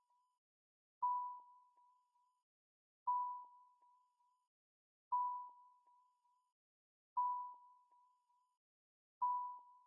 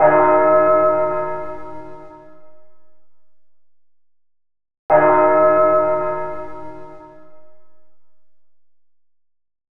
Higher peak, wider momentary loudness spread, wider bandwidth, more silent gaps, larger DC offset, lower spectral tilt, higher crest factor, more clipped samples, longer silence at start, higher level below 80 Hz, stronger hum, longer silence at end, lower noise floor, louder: second, -32 dBFS vs 0 dBFS; second, 15 LU vs 23 LU; second, 1.3 kHz vs 3.4 kHz; first, 2.43-3.06 s, 4.47-5.11 s, 6.52-7.16 s, 8.57-9.21 s vs 4.79-4.89 s; neither; second, 14.5 dB/octave vs -9.5 dB/octave; about the same, 18 dB vs 20 dB; neither; first, 1 s vs 0 s; second, under -90 dBFS vs -54 dBFS; neither; about the same, 0.15 s vs 0.1 s; first, -80 dBFS vs -60 dBFS; second, -43 LUFS vs -15 LUFS